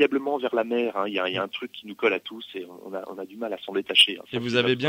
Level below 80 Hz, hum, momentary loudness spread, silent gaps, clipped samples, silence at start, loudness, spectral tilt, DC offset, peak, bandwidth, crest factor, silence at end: -72 dBFS; none; 18 LU; none; under 0.1%; 0 s; -24 LUFS; -4 dB/octave; under 0.1%; -6 dBFS; 16 kHz; 20 dB; 0 s